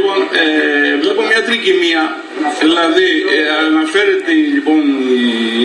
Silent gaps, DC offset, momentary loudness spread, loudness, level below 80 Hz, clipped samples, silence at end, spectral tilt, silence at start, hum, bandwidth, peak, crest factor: none; under 0.1%; 3 LU; -12 LUFS; -62 dBFS; under 0.1%; 0 s; -3 dB/octave; 0 s; none; 11 kHz; 0 dBFS; 12 dB